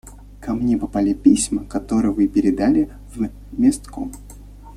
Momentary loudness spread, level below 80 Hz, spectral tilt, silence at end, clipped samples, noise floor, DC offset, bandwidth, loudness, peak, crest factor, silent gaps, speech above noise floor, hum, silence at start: 15 LU; -38 dBFS; -5.5 dB/octave; 0 s; under 0.1%; -39 dBFS; under 0.1%; 13.5 kHz; -19 LUFS; -2 dBFS; 18 dB; none; 20 dB; 50 Hz at -35 dBFS; 0.05 s